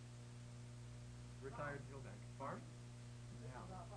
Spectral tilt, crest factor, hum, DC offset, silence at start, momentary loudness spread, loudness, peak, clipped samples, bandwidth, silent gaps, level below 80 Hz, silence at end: -6 dB/octave; 16 dB; 60 Hz at -55 dBFS; under 0.1%; 0 s; 7 LU; -53 LUFS; -36 dBFS; under 0.1%; 11 kHz; none; -66 dBFS; 0 s